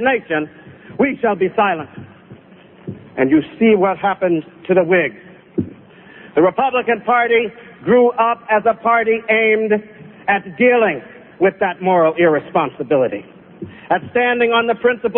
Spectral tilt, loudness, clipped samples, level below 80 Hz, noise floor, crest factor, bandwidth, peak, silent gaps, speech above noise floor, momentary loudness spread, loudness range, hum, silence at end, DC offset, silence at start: -11 dB/octave; -16 LUFS; under 0.1%; -56 dBFS; -44 dBFS; 16 dB; 3.8 kHz; -2 dBFS; none; 28 dB; 14 LU; 3 LU; none; 0 s; under 0.1%; 0 s